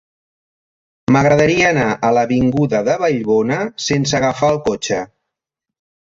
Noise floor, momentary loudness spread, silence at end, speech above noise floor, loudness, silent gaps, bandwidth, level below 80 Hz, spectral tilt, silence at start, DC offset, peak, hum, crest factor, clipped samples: -82 dBFS; 8 LU; 1.05 s; 67 dB; -15 LUFS; none; 7.8 kHz; -46 dBFS; -5.5 dB/octave; 1.1 s; under 0.1%; -2 dBFS; none; 16 dB; under 0.1%